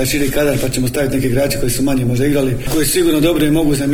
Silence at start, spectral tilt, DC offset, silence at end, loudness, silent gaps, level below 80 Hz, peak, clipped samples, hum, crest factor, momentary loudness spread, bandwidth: 0 s; -5 dB/octave; under 0.1%; 0 s; -15 LUFS; none; -28 dBFS; -2 dBFS; under 0.1%; none; 12 dB; 4 LU; 18 kHz